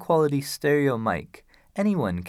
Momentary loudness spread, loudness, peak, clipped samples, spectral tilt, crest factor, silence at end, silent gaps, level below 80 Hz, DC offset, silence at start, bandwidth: 8 LU; -24 LUFS; -10 dBFS; under 0.1%; -6.5 dB/octave; 14 dB; 0 s; none; -58 dBFS; under 0.1%; 0 s; 16.5 kHz